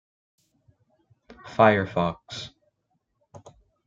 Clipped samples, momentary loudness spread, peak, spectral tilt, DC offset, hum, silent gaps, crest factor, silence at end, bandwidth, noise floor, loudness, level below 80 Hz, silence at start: under 0.1%; 18 LU; -4 dBFS; -6.5 dB/octave; under 0.1%; none; none; 24 dB; 1.4 s; 7.6 kHz; -75 dBFS; -23 LUFS; -62 dBFS; 1.45 s